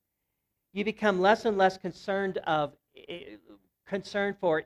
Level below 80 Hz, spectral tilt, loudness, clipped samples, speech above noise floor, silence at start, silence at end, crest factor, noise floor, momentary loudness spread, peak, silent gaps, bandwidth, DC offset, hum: -66 dBFS; -5.5 dB/octave; -28 LUFS; under 0.1%; 54 dB; 0.75 s; 0.05 s; 20 dB; -82 dBFS; 19 LU; -10 dBFS; none; 12 kHz; under 0.1%; none